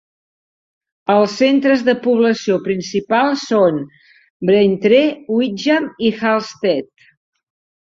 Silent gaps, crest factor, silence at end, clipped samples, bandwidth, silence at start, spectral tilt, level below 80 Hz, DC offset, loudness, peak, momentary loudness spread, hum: 4.30-4.40 s; 16 dB; 1.1 s; under 0.1%; 7.8 kHz; 1.1 s; -5.5 dB/octave; -60 dBFS; under 0.1%; -16 LUFS; -2 dBFS; 7 LU; none